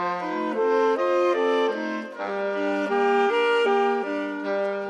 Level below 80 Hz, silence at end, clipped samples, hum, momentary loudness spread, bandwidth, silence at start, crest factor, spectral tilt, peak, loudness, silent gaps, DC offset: -78 dBFS; 0 s; under 0.1%; none; 8 LU; 9.6 kHz; 0 s; 12 dB; -5 dB/octave; -10 dBFS; -24 LUFS; none; under 0.1%